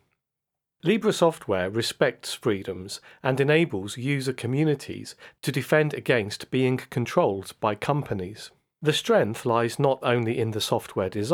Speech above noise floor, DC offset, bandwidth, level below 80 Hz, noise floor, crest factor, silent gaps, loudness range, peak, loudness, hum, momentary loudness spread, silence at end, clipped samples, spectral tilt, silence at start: 60 dB; under 0.1%; 18.5 kHz; -66 dBFS; -85 dBFS; 20 dB; none; 1 LU; -6 dBFS; -25 LUFS; none; 11 LU; 0 s; under 0.1%; -5.5 dB/octave; 0.85 s